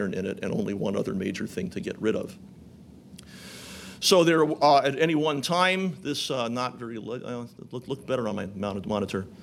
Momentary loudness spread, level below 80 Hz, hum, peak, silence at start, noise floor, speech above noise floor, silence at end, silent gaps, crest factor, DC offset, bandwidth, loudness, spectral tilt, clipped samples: 20 LU; -62 dBFS; none; -6 dBFS; 0 s; -49 dBFS; 22 dB; 0 s; none; 20 dB; under 0.1%; 16 kHz; -26 LUFS; -4.5 dB/octave; under 0.1%